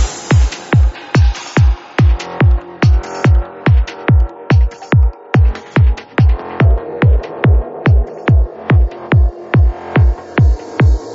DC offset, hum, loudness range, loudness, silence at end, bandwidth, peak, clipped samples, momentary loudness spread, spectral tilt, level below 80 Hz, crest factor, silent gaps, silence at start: under 0.1%; none; 0 LU; -14 LUFS; 0 s; 7.8 kHz; 0 dBFS; under 0.1%; 1 LU; -7 dB/octave; -14 dBFS; 12 dB; none; 0 s